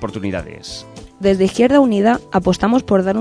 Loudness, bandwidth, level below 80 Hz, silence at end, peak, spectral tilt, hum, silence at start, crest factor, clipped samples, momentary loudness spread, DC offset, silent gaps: -15 LUFS; 10.5 kHz; -40 dBFS; 0 s; 0 dBFS; -6.5 dB/octave; none; 0 s; 16 dB; under 0.1%; 18 LU; under 0.1%; none